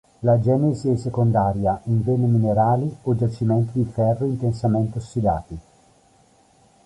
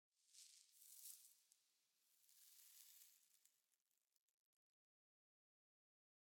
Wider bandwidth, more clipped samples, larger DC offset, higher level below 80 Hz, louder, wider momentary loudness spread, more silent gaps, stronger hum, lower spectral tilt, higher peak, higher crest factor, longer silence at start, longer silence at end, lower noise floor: second, 10.5 kHz vs 19 kHz; neither; neither; first, -44 dBFS vs under -90 dBFS; first, -21 LUFS vs -64 LUFS; second, 5 LU vs 8 LU; second, none vs 3.82-3.86 s; neither; first, -10 dB/octave vs 4 dB/octave; first, -6 dBFS vs -38 dBFS; second, 16 dB vs 34 dB; about the same, 0.2 s vs 0.15 s; second, 1.25 s vs 2.15 s; second, -56 dBFS vs under -90 dBFS